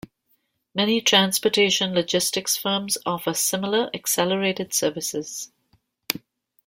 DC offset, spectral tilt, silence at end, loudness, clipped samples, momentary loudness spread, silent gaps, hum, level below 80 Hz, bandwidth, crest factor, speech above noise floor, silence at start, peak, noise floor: under 0.1%; -2.5 dB/octave; 0.5 s; -22 LUFS; under 0.1%; 12 LU; none; none; -66 dBFS; 16.5 kHz; 24 dB; 46 dB; 0.75 s; 0 dBFS; -69 dBFS